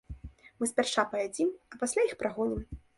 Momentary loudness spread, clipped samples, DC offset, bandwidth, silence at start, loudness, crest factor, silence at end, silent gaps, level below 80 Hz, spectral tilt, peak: 15 LU; under 0.1%; under 0.1%; 11.5 kHz; 0.1 s; -31 LUFS; 20 dB; 0.2 s; none; -52 dBFS; -3.5 dB/octave; -12 dBFS